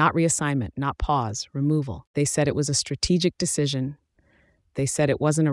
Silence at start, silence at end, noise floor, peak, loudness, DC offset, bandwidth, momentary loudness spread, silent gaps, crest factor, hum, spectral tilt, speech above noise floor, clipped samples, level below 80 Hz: 0 s; 0 s; -62 dBFS; -8 dBFS; -24 LUFS; under 0.1%; 12 kHz; 7 LU; 2.07-2.14 s; 16 dB; none; -4.5 dB/octave; 39 dB; under 0.1%; -44 dBFS